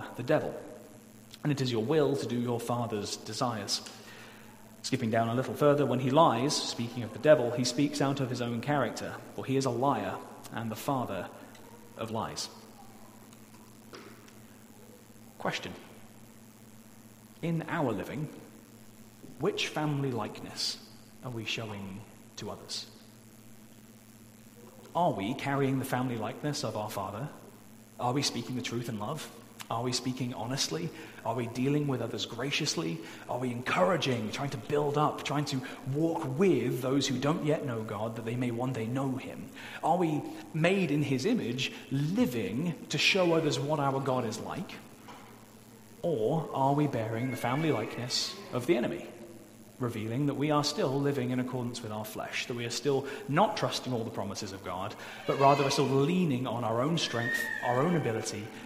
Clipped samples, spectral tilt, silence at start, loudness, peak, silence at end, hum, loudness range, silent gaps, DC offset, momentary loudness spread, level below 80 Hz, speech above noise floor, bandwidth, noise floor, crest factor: under 0.1%; -5 dB/octave; 0 s; -31 LUFS; -8 dBFS; 0 s; none; 10 LU; none; under 0.1%; 17 LU; -68 dBFS; 23 dB; 16 kHz; -54 dBFS; 24 dB